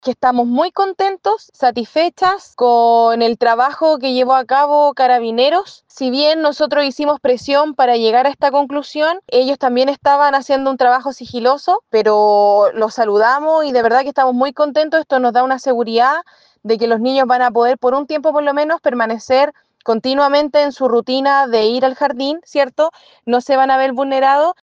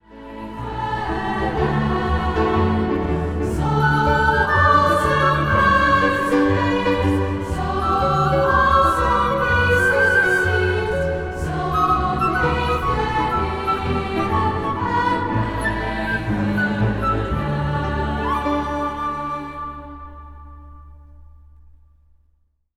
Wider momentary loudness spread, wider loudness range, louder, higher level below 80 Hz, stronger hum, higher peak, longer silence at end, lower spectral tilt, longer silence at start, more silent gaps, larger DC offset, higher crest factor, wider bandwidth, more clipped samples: second, 6 LU vs 9 LU; second, 2 LU vs 8 LU; first, -14 LUFS vs -19 LUFS; second, -62 dBFS vs -32 dBFS; neither; about the same, 0 dBFS vs -2 dBFS; second, 0.1 s vs 1.5 s; second, -4 dB/octave vs -6.5 dB/octave; about the same, 0.05 s vs 0.1 s; neither; neither; about the same, 14 dB vs 16 dB; second, 7.8 kHz vs 15 kHz; neither